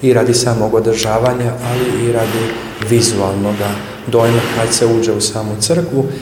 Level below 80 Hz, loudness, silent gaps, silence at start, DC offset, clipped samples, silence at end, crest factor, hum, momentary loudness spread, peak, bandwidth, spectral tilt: -42 dBFS; -14 LUFS; none; 0 s; under 0.1%; under 0.1%; 0 s; 14 dB; none; 6 LU; 0 dBFS; 19.5 kHz; -4.5 dB/octave